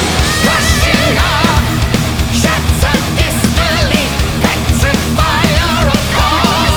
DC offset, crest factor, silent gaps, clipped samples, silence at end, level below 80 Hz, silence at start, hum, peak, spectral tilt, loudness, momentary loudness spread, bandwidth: under 0.1%; 12 dB; none; under 0.1%; 0 s; -18 dBFS; 0 s; none; 0 dBFS; -4 dB/octave; -11 LUFS; 3 LU; over 20 kHz